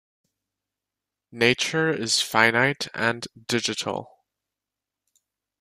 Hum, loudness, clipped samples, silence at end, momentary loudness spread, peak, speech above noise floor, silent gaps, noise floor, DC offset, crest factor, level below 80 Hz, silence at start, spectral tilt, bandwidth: none; -23 LUFS; under 0.1%; 1.55 s; 11 LU; -4 dBFS; 64 dB; none; -88 dBFS; under 0.1%; 24 dB; -66 dBFS; 1.35 s; -3 dB/octave; 15.5 kHz